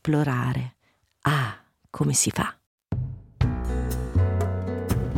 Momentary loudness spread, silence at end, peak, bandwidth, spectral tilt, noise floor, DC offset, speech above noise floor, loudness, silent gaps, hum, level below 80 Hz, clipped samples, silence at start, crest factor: 11 LU; 0 s; -8 dBFS; 16.5 kHz; -5 dB/octave; -67 dBFS; under 0.1%; 43 dB; -26 LUFS; 2.66-2.78 s; none; -36 dBFS; under 0.1%; 0.05 s; 18 dB